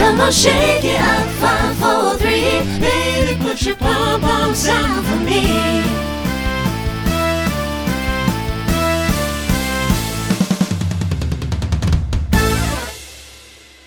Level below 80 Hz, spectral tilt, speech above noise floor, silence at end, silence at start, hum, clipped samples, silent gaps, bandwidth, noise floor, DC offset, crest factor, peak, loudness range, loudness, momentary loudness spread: -26 dBFS; -4.5 dB/octave; 27 dB; 0.35 s; 0 s; none; under 0.1%; none; over 20 kHz; -42 dBFS; under 0.1%; 16 dB; 0 dBFS; 4 LU; -16 LUFS; 6 LU